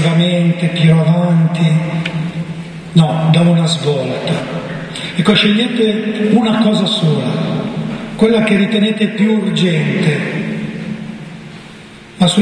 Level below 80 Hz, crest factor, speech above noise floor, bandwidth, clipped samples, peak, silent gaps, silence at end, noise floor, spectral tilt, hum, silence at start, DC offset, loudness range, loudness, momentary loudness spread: -50 dBFS; 14 dB; 23 dB; 10.5 kHz; under 0.1%; 0 dBFS; none; 0 s; -35 dBFS; -6.5 dB/octave; none; 0 s; under 0.1%; 2 LU; -14 LUFS; 13 LU